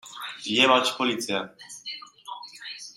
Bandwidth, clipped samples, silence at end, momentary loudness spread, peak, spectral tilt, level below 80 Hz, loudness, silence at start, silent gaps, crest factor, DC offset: 16 kHz; under 0.1%; 0.05 s; 20 LU; -6 dBFS; -2.5 dB/octave; -76 dBFS; -23 LUFS; 0.05 s; none; 22 dB; under 0.1%